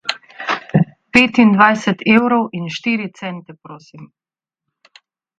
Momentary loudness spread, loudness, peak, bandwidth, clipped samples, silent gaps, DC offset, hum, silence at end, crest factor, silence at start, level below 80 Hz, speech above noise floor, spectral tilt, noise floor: 16 LU; -15 LUFS; 0 dBFS; 9 kHz; under 0.1%; none; under 0.1%; none; 1.35 s; 18 dB; 0.05 s; -54 dBFS; 65 dB; -6 dB/octave; -81 dBFS